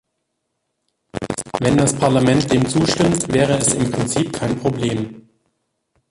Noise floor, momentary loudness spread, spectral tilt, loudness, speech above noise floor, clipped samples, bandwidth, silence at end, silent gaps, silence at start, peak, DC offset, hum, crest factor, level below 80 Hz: -74 dBFS; 10 LU; -5 dB/octave; -18 LUFS; 57 dB; under 0.1%; 11.5 kHz; 0.9 s; none; 1.15 s; -2 dBFS; under 0.1%; none; 16 dB; -44 dBFS